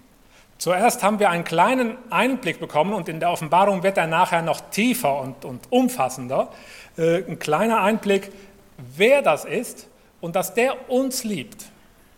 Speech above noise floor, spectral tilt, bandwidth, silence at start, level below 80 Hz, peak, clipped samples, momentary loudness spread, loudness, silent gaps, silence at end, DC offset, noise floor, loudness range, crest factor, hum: 31 dB; -4.5 dB/octave; 17.5 kHz; 0.6 s; -60 dBFS; -2 dBFS; under 0.1%; 13 LU; -21 LUFS; none; 0.5 s; under 0.1%; -52 dBFS; 2 LU; 20 dB; none